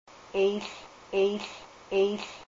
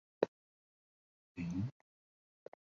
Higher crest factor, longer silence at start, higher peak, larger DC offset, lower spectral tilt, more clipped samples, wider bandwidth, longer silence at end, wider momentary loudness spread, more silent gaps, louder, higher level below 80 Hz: second, 14 dB vs 30 dB; about the same, 0.1 s vs 0.2 s; about the same, -16 dBFS vs -14 dBFS; neither; second, -5 dB/octave vs -8 dB/octave; neither; about the same, 7.6 kHz vs 7.4 kHz; second, 0.05 s vs 1.1 s; second, 14 LU vs 19 LU; second, none vs 0.28-1.35 s; first, -29 LUFS vs -42 LUFS; about the same, -64 dBFS vs -66 dBFS